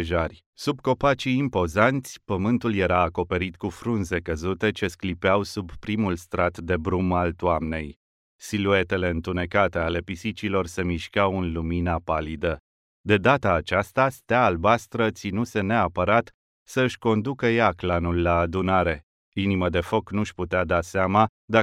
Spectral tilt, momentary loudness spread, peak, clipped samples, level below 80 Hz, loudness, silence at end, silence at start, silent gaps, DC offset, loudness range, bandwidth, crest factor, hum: -6.5 dB/octave; 9 LU; -4 dBFS; under 0.1%; -44 dBFS; -24 LUFS; 0 s; 0 s; 0.46-0.53 s, 7.96-8.39 s, 12.60-13.04 s, 16.34-16.66 s, 19.03-19.32 s, 21.29-21.48 s; under 0.1%; 3 LU; 15 kHz; 20 dB; none